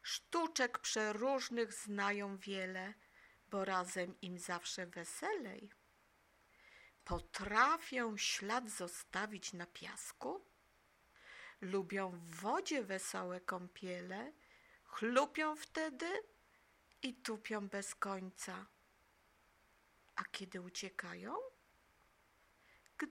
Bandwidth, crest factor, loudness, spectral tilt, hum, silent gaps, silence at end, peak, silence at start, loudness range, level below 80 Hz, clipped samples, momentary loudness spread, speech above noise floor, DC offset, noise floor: 16.5 kHz; 26 dB; -41 LUFS; -3 dB/octave; none; none; 0 s; -18 dBFS; 0.05 s; 9 LU; -68 dBFS; under 0.1%; 12 LU; 31 dB; under 0.1%; -73 dBFS